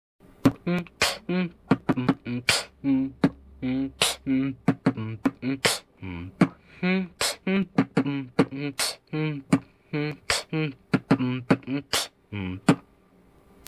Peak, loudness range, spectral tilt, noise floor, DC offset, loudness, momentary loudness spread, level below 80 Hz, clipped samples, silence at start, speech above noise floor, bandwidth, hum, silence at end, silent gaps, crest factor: -6 dBFS; 2 LU; -4.5 dB/octave; -58 dBFS; under 0.1%; -26 LUFS; 6 LU; -54 dBFS; under 0.1%; 0.45 s; 32 dB; 16 kHz; none; 0.85 s; none; 20 dB